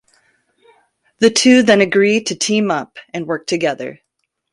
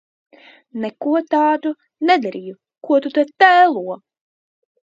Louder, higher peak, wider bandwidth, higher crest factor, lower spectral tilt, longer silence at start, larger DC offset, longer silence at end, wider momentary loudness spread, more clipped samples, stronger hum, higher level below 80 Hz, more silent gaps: first, -14 LUFS vs -17 LUFS; about the same, 0 dBFS vs 0 dBFS; first, 11.5 kHz vs 7.6 kHz; about the same, 16 dB vs 18 dB; second, -3.5 dB/octave vs -5.5 dB/octave; first, 1.2 s vs 0.75 s; neither; second, 0.6 s vs 0.95 s; second, 17 LU vs 21 LU; neither; neither; first, -60 dBFS vs -76 dBFS; neither